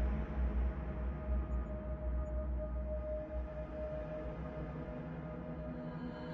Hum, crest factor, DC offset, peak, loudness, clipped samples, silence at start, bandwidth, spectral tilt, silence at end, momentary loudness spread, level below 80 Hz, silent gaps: none; 12 dB; under 0.1%; -26 dBFS; -42 LUFS; under 0.1%; 0 s; 4.5 kHz; -8.5 dB/octave; 0 s; 6 LU; -40 dBFS; none